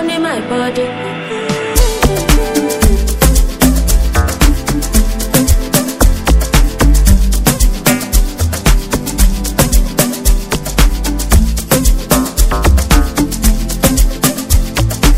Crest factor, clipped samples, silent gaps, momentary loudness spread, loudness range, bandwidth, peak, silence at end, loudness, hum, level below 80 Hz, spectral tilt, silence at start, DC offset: 10 dB; 0.6%; none; 5 LU; 2 LU; 16.5 kHz; 0 dBFS; 0 s; -13 LUFS; none; -12 dBFS; -4.5 dB/octave; 0 s; under 0.1%